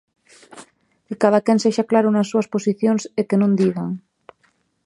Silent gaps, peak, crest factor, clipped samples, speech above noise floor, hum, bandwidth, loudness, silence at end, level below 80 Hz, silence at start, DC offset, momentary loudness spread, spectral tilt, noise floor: none; -2 dBFS; 18 dB; under 0.1%; 46 dB; none; 11 kHz; -19 LUFS; 0.85 s; -70 dBFS; 0.55 s; under 0.1%; 10 LU; -6.5 dB/octave; -64 dBFS